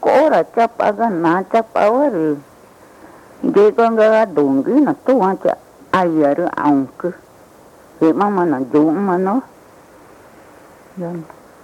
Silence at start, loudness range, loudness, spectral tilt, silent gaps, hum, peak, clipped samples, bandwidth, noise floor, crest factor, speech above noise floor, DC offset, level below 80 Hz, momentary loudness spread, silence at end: 0 s; 4 LU; -15 LUFS; -7.5 dB/octave; none; none; -2 dBFS; under 0.1%; 13 kHz; -44 dBFS; 14 dB; 29 dB; under 0.1%; -62 dBFS; 12 LU; 0.4 s